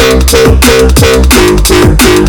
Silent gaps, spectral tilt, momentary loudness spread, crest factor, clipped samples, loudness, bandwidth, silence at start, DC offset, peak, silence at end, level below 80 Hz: none; -4.5 dB/octave; 1 LU; 4 dB; 20%; -5 LUFS; over 20 kHz; 0 s; under 0.1%; 0 dBFS; 0 s; -10 dBFS